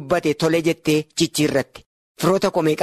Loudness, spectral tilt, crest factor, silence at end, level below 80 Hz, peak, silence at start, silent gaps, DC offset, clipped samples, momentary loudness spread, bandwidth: -20 LUFS; -5 dB/octave; 14 dB; 0 s; -54 dBFS; -6 dBFS; 0 s; 1.86-2.15 s; under 0.1%; under 0.1%; 4 LU; 13.5 kHz